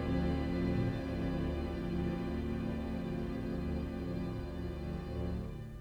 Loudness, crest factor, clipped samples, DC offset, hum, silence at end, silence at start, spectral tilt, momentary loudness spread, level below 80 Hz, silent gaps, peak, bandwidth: -38 LUFS; 14 dB; under 0.1%; under 0.1%; none; 0 s; 0 s; -8.5 dB/octave; 7 LU; -44 dBFS; none; -22 dBFS; 12 kHz